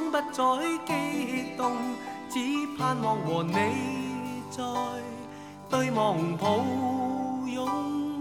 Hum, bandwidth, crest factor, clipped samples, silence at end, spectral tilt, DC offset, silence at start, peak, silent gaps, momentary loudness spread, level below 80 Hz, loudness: none; 17 kHz; 18 dB; under 0.1%; 0 s; -5.5 dB/octave; under 0.1%; 0 s; -12 dBFS; none; 8 LU; -70 dBFS; -29 LUFS